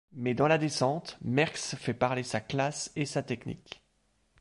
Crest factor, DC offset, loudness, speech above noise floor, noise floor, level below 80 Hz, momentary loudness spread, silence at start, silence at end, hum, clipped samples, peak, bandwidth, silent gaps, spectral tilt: 20 dB; under 0.1%; -30 LUFS; 42 dB; -72 dBFS; -64 dBFS; 13 LU; 0.15 s; 0.65 s; none; under 0.1%; -12 dBFS; 11.5 kHz; none; -5 dB/octave